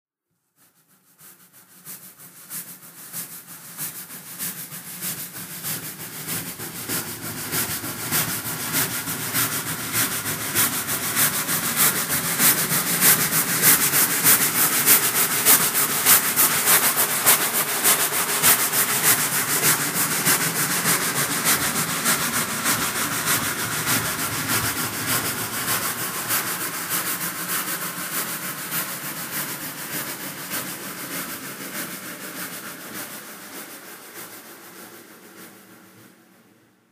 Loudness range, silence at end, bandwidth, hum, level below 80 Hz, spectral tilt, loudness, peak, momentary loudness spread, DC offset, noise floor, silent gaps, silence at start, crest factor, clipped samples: 18 LU; 0.9 s; 15.5 kHz; none; -60 dBFS; -1 dB/octave; -20 LUFS; 0 dBFS; 18 LU; under 0.1%; -76 dBFS; none; 1.2 s; 24 dB; under 0.1%